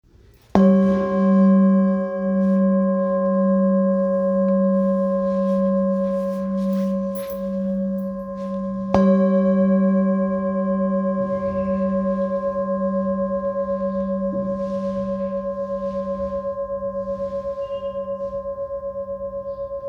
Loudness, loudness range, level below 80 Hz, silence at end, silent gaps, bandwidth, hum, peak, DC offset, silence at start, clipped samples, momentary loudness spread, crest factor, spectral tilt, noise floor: -21 LUFS; 8 LU; -48 dBFS; 0 s; none; over 20 kHz; none; 0 dBFS; under 0.1%; 0.55 s; under 0.1%; 11 LU; 20 dB; -10 dB/octave; -51 dBFS